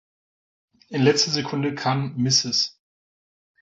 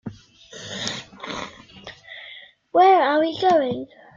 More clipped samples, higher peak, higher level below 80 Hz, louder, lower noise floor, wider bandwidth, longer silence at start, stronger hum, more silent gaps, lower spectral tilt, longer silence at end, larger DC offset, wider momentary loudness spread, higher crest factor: neither; about the same, -6 dBFS vs -4 dBFS; about the same, -64 dBFS vs -62 dBFS; about the same, -22 LUFS vs -20 LUFS; first, under -90 dBFS vs -44 dBFS; about the same, 8 kHz vs 7.6 kHz; first, 0.9 s vs 0.05 s; neither; neither; about the same, -4 dB/octave vs -4 dB/octave; first, 0.9 s vs 0.3 s; neither; second, 8 LU vs 25 LU; about the same, 18 dB vs 18 dB